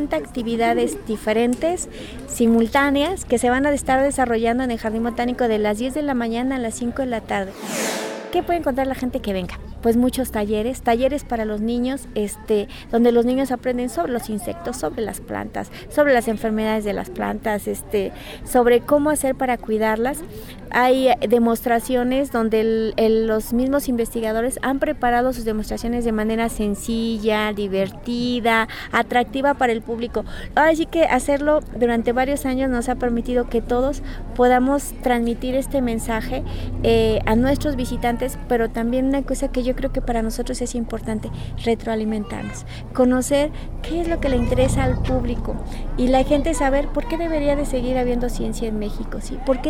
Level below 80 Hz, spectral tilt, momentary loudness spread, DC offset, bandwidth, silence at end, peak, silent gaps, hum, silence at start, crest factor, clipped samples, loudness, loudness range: -32 dBFS; -5 dB/octave; 9 LU; under 0.1%; 17.5 kHz; 0 s; -4 dBFS; none; none; 0 s; 16 dB; under 0.1%; -21 LUFS; 4 LU